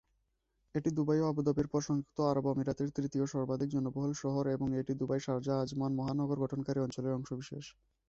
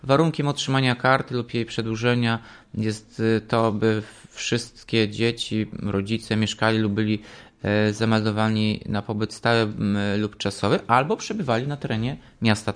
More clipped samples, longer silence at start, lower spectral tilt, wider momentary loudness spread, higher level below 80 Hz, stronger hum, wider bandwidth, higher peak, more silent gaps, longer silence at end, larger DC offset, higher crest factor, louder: neither; first, 0.75 s vs 0 s; first, -7.5 dB/octave vs -5.5 dB/octave; about the same, 6 LU vs 7 LU; second, -62 dBFS vs -54 dBFS; neither; second, 7.8 kHz vs 10.5 kHz; second, -18 dBFS vs -4 dBFS; neither; first, 0.4 s vs 0 s; neither; about the same, 16 dB vs 20 dB; second, -35 LUFS vs -24 LUFS